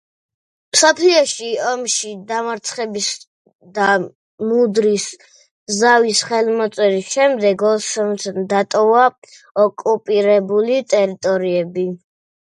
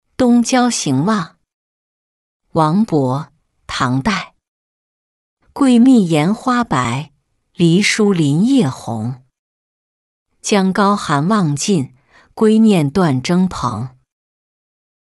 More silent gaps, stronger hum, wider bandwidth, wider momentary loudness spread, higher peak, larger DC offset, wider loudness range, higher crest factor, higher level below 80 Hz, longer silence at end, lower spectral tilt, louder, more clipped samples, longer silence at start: second, 3.27-3.45 s, 3.55-3.59 s, 4.15-4.38 s, 5.51-5.67 s, 9.18-9.22 s, 9.51-9.55 s vs 1.54-2.40 s, 4.48-5.37 s, 9.39-10.26 s; neither; about the same, 11.5 kHz vs 12 kHz; second, 10 LU vs 14 LU; about the same, 0 dBFS vs -2 dBFS; neither; about the same, 4 LU vs 5 LU; about the same, 18 dB vs 14 dB; second, -68 dBFS vs -48 dBFS; second, 0.65 s vs 1.15 s; second, -3 dB/octave vs -5.5 dB/octave; about the same, -16 LUFS vs -15 LUFS; neither; first, 0.75 s vs 0.2 s